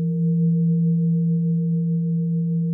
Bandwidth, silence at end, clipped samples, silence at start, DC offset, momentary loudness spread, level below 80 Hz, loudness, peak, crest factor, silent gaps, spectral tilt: 0.5 kHz; 0 s; under 0.1%; 0 s; under 0.1%; 3 LU; -68 dBFS; -21 LUFS; -14 dBFS; 6 dB; none; -16.5 dB/octave